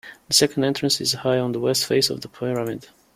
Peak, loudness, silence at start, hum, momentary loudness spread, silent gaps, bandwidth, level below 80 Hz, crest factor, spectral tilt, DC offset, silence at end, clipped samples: -4 dBFS; -21 LUFS; 0.05 s; none; 10 LU; none; 16.5 kHz; -60 dBFS; 20 dB; -3.5 dB/octave; under 0.1%; 0.3 s; under 0.1%